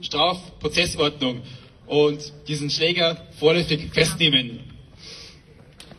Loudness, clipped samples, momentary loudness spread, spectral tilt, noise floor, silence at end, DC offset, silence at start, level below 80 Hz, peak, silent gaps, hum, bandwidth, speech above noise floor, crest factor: -21 LUFS; under 0.1%; 21 LU; -4 dB/octave; -48 dBFS; 0.15 s; under 0.1%; 0 s; -48 dBFS; -4 dBFS; none; none; 13 kHz; 26 dB; 20 dB